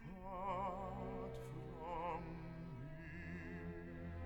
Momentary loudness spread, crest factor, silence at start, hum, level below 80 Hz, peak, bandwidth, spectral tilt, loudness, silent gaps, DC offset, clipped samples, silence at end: 8 LU; 14 dB; 0 s; none; -58 dBFS; -34 dBFS; 19 kHz; -8 dB/octave; -48 LUFS; none; under 0.1%; under 0.1%; 0 s